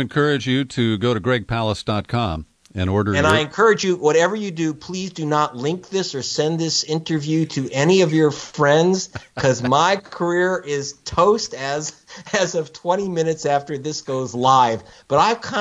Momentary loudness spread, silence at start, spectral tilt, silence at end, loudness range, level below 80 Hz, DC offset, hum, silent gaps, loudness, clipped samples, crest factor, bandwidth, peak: 10 LU; 0 s; -5 dB/octave; 0 s; 3 LU; -50 dBFS; under 0.1%; none; none; -20 LUFS; under 0.1%; 20 dB; 11 kHz; 0 dBFS